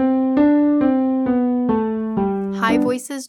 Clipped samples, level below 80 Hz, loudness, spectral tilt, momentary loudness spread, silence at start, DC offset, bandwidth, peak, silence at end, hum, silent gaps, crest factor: under 0.1%; -50 dBFS; -18 LUFS; -6.5 dB/octave; 6 LU; 0 s; under 0.1%; 12.5 kHz; -4 dBFS; 0 s; none; none; 12 dB